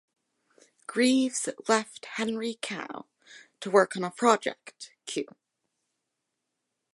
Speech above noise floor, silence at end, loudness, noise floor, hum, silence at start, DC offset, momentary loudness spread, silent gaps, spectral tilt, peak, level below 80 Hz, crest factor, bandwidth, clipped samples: 56 dB; 1.7 s; -28 LUFS; -83 dBFS; none; 0.9 s; under 0.1%; 19 LU; none; -3.5 dB/octave; -6 dBFS; -82 dBFS; 24 dB; 11.5 kHz; under 0.1%